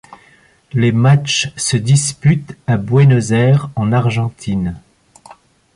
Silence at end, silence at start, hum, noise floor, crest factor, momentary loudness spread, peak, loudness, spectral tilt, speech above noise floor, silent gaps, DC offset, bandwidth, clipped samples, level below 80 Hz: 0.45 s; 0.1 s; none; -50 dBFS; 12 dB; 9 LU; -2 dBFS; -14 LUFS; -5.5 dB/octave; 36 dB; none; under 0.1%; 11.5 kHz; under 0.1%; -44 dBFS